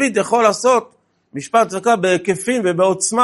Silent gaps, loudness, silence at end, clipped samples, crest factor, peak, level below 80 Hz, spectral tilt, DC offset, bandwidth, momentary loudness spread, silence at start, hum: none; -16 LUFS; 0 s; under 0.1%; 16 dB; 0 dBFS; -64 dBFS; -4 dB/octave; under 0.1%; 11.5 kHz; 5 LU; 0 s; none